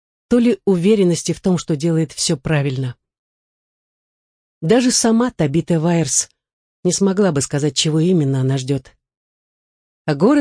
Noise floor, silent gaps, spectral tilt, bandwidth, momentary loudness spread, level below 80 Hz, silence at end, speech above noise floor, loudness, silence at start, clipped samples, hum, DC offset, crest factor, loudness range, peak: under -90 dBFS; 3.19-4.61 s, 6.53-6.83 s, 9.17-10.05 s; -5 dB/octave; 10.5 kHz; 9 LU; -50 dBFS; 0 s; over 74 dB; -17 LUFS; 0.3 s; under 0.1%; none; under 0.1%; 14 dB; 4 LU; -4 dBFS